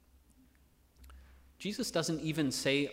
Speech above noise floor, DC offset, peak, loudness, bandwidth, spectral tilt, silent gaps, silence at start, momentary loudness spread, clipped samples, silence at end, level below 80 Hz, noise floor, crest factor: 33 dB; under 0.1%; -18 dBFS; -34 LUFS; 16 kHz; -4 dB/octave; none; 1 s; 9 LU; under 0.1%; 0 s; -62 dBFS; -66 dBFS; 20 dB